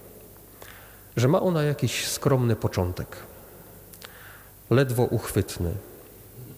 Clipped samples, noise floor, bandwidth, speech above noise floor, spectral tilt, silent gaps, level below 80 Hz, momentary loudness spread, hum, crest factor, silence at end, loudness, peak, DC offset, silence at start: under 0.1%; -48 dBFS; 19 kHz; 24 dB; -5.5 dB/octave; none; -50 dBFS; 23 LU; none; 18 dB; 0 s; -25 LUFS; -10 dBFS; under 0.1%; 0.05 s